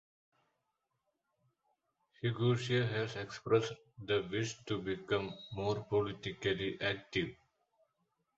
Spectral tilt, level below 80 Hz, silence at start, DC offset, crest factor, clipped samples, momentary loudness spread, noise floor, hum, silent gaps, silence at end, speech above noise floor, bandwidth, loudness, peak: -4.5 dB/octave; -66 dBFS; 2.25 s; under 0.1%; 22 dB; under 0.1%; 7 LU; -85 dBFS; none; none; 1.05 s; 49 dB; 8 kHz; -36 LUFS; -16 dBFS